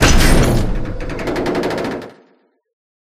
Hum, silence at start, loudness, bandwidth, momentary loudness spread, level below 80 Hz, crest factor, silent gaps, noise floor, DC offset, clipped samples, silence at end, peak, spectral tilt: none; 0 s; -18 LUFS; 15.5 kHz; 13 LU; -20 dBFS; 16 dB; none; -56 dBFS; under 0.1%; under 0.1%; 1.1 s; 0 dBFS; -4.5 dB/octave